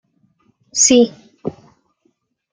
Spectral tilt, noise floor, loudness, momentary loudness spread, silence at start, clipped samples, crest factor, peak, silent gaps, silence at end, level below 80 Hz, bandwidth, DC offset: -2 dB/octave; -65 dBFS; -13 LUFS; 19 LU; 0.75 s; under 0.1%; 18 dB; 0 dBFS; none; 1 s; -60 dBFS; 10 kHz; under 0.1%